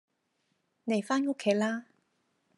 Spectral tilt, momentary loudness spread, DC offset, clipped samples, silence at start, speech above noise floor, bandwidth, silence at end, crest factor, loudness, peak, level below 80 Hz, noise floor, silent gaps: -5 dB/octave; 10 LU; under 0.1%; under 0.1%; 0.85 s; 48 dB; 11.5 kHz; 0.75 s; 20 dB; -30 LUFS; -14 dBFS; -88 dBFS; -77 dBFS; none